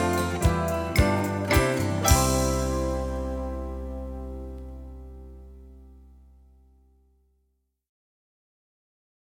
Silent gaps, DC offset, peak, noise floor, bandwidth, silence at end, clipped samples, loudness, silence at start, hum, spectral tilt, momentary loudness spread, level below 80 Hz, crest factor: none; under 0.1%; -6 dBFS; -74 dBFS; 18 kHz; 3.35 s; under 0.1%; -25 LUFS; 0 s; none; -5 dB/octave; 22 LU; -34 dBFS; 22 dB